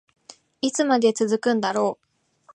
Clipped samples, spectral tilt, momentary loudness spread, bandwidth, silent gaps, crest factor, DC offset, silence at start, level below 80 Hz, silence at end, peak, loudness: under 0.1%; -4 dB/octave; 8 LU; 11.5 kHz; none; 18 dB; under 0.1%; 0.65 s; -76 dBFS; 0.6 s; -6 dBFS; -22 LUFS